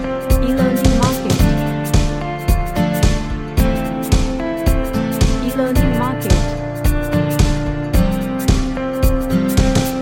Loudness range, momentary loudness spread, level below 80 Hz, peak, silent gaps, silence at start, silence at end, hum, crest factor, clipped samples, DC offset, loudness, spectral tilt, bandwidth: 1 LU; 5 LU; -20 dBFS; 0 dBFS; none; 0 s; 0 s; none; 16 dB; under 0.1%; under 0.1%; -17 LUFS; -6 dB/octave; 17 kHz